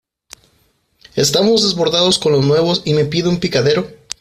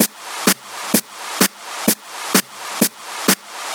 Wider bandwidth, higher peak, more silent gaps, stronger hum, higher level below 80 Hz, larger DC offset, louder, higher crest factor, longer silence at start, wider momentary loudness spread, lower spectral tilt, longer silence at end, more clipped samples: second, 15.5 kHz vs over 20 kHz; about the same, 0 dBFS vs 0 dBFS; neither; neither; first, -50 dBFS vs -66 dBFS; neither; first, -14 LUFS vs -19 LUFS; about the same, 16 dB vs 20 dB; first, 1.15 s vs 0 s; about the same, 5 LU vs 4 LU; first, -4.5 dB/octave vs -2 dB/octave; first, 0.25 s vs 0 s; neither